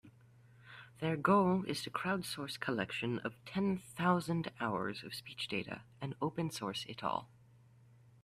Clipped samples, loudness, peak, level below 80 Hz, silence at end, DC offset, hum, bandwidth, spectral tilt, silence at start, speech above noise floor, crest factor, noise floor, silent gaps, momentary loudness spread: under 0.1%; -37 LUFS; -16 dBFS; -72 dBFS; 0.95 s; under 0.1%; none; 14.5 kHz; -5.5 dB/octave; 0.05 s; 26 dB; 22 dB; -63 dBFS; none; 13 LU